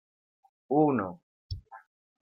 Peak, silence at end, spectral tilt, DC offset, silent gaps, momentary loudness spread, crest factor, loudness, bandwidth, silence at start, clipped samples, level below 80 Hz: -12 dBFS; 0.45 s; -10 dB/octave; under 0.1%; 1.23-1.50 s; 18 LU; 20 dB; -28 LUFS; 5.8 kHz; 0.7 s; under 0.1%; -56 dBFS